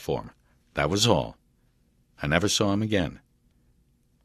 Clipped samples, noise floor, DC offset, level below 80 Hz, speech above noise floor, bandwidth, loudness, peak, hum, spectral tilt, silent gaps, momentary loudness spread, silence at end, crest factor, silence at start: under 0.1%; -65 dBFS; under 0.1%; -46 dBFS; 40 dB; 14 kHz; -26 LUFS; -4 dBFS; none; -4 dB/octave; none; 12 LU; 1.05 s; 24 dB; 0 s